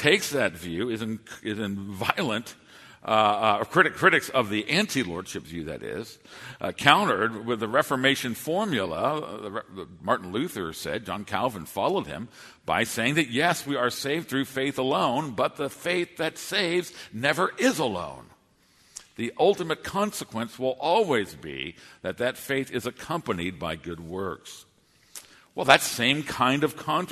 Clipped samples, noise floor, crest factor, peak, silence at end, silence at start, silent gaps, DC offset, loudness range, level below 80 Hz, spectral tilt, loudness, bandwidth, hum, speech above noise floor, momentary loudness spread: under 0.1%; -62 dBFS; 26 dB; 0 dBFS; 0 s; 0 s; none; under 0.1%; 6 LU; -60 dBFS; -4 dB/octave; -26 LUFS; 13.5 kHz; none; 35 dB; 15 LU